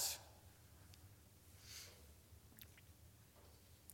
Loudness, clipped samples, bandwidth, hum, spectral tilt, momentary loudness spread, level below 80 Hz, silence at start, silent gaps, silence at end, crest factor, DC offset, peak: -57 LUFS; under 0.1%; 16.5 kHz; none; -1 dB/octave; 11 LU; -70 dBFS; 0 s; none; 0 s; 26 dB; under 0.1%; -30 dBFS